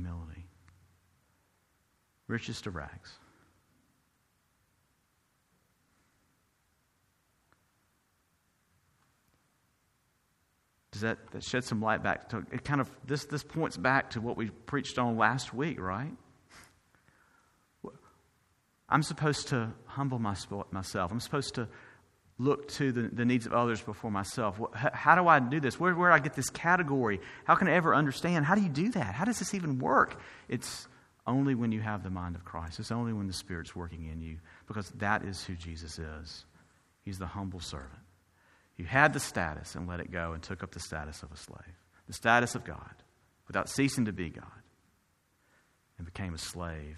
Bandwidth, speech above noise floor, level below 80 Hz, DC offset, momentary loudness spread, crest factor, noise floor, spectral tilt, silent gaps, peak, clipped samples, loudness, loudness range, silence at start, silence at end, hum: 13.5 kHz; 42 dB; -56 dBFS; under 0.1%; 19 LU; 26 dB; -74 dBFS; -5 dB/octave; none; -6 dBFS; under 0.1%; -31 LUFS; 16 LU; 0 s; 0 s; none